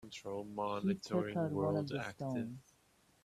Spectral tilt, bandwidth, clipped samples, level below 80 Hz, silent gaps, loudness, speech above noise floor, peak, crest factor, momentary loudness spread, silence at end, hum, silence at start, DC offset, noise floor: -7 dB/octave; 13.5 kHz; under 0.1%; -72 dBFS; none; -39 LUFS; 33 dB; -22 dBFS; 18 dB; 9 LU; 0.65 s; none; 0 s; under 0.1%; -71 dBFS